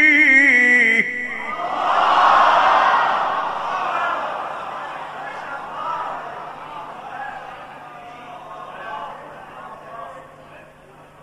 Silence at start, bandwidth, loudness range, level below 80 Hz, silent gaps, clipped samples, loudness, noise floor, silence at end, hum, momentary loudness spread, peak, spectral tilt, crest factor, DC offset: 0 s; 12 kHz; 20 LU; -60 dBFS; none; under 0.1%; -16 LUFS; -45 dBFS; 0.2 s; none; 25 LU; -2 dBFS; -3 dB/octave; 18 dB; under 0.1%